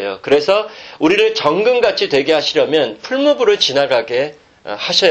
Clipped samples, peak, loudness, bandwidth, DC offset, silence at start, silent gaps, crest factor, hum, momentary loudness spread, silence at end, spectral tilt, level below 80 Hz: under 0.1%; 0 dBFS; -14 LUFS; 8.4 kHz; under 0.1%; 0 s; none; 14 dB; none; 8 LU; 0 s; -3.5 dB/octave; -56 dBFS